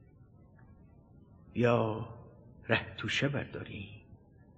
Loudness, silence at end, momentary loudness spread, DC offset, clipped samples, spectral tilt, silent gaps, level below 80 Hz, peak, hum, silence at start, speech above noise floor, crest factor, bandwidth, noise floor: -33 LUFS; 0.4 s; 21 LU; under 0.1%; under 0.1%; -6 dB/octave; none; -62 dBFS; -12 dBFS; none; 0.2 s; 26 dB; 24 dB; 8.4 kHz; -58 dBFS